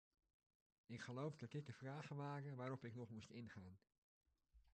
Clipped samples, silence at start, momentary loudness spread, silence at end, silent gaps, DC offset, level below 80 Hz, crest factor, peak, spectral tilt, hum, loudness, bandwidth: under 0.1%; 0.9 s; 8 LU; 0.05 s; 3.98-4.21 s; under 0.1%; -80 dBFS; 18 dB; -38 dBFS; -7 dB/octave; none; -54 LUFS; 9.4 kHz